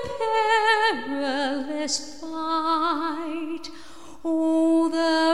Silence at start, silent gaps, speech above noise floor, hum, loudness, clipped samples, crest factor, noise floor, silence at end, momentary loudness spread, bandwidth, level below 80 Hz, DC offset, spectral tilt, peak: 0 s; none; 19 dB; none; -24 LUFS; under 0.1%; 16 dB; -45 dBFS; 0 s; 13 LU; 11.5 kHz; -60 dBFS; 1%; -2.5 dB/octave; -8 dBFS